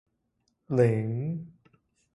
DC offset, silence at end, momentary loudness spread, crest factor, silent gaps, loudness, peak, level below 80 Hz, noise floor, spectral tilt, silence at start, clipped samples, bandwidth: under 0.1%; 0.7 s; 14 LU; 20 dB; none; -28 LUFS; -10 dBFS; -66 dBFS; -76 dBFS; -9.5 dB/octave; 0.7 s; under 0.1%; 11 kHz